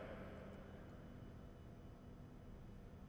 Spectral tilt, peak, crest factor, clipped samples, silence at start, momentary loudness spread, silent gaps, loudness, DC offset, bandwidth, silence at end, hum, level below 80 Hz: -7.5 dB/octave; -40 dBFS; 14 dB; under 0.1%; 0 s; 5 LU; none; -58 LUFS; under 0.1%; over 20 kHz; 0 s; none; -62 dBFS